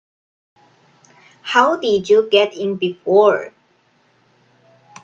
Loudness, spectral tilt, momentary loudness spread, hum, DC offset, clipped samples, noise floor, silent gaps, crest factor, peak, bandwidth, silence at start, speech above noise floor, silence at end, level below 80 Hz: -16 LUFS; -4.5 dB/octave; 10 LU; none; under 0.1%; under 0.1%; -58 dBFS; none; 18 dB; 0 dBFS; 7.6 kHz; 1.45 s; 43 dB; 1.55 s; -66 dBFS